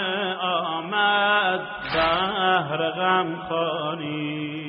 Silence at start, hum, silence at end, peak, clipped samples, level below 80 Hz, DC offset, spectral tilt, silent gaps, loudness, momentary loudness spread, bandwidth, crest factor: 0 s; none; 0 s; -8 dBFS; under 0.1%; -54 dBFS; under 0.1%; -1.5 dB/octave; none; -23 LUFS; 9 LU; 4.9 kHz; 16 dB